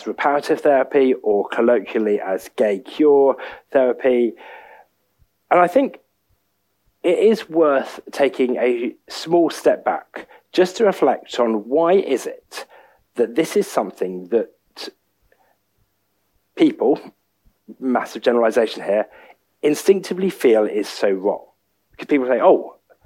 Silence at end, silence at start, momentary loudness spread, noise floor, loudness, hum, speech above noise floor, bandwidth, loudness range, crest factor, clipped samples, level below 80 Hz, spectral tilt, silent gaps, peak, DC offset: 0.35 s; 0 s; 14 LU; -70 dBFS; -19 LUFS; none; 52 dB; 16 kHz; 6 LU; 18 dB; under 0.1%; -68 dBFS; -5 dB/octave; none; 0 dBFS; under 0.1%